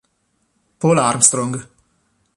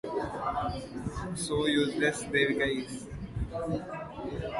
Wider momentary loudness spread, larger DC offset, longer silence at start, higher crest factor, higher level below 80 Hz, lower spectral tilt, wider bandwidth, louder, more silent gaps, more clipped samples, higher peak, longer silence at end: about the same, 13 LU vs 12 LU; neither; first, 0.8 s vs 0.05 s; about the same, 20 dB vs 18 dB; second, -58 dBFS vs -46 dBFS; about the same, -4 dB/octave vs -4.5 dB/octave; first, 13 kHz vs 11.5 kHz; first, -15 LUFS vs -32 LUFS; neither; neither; first, 0 dBFS vs -12 dBFS; first, 0.75 s vs 0 s